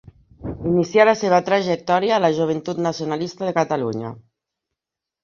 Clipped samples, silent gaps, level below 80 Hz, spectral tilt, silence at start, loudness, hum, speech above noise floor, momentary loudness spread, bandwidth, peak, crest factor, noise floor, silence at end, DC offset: under 0.1%; none; -50 dBFS; -6 dB/octave; 0.4 s; -20 LUFS; none; 66 dB; 13 LU; 7.4 kHz; -2 dBFS; 18 dB; -85 dBFS; 1.05 s; under 0.1%